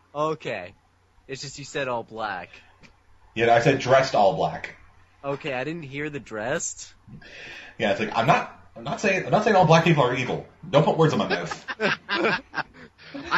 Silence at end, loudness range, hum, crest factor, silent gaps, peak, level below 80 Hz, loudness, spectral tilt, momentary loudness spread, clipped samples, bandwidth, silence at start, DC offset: 0 s; 10 LU; none; 22 dB; none; -4 dBFS; -58 dBFS; -23 LUFS; -5 dB/octave; 20 LU; under 0.1%; 12 kHz; 0.15 s; under 0.1%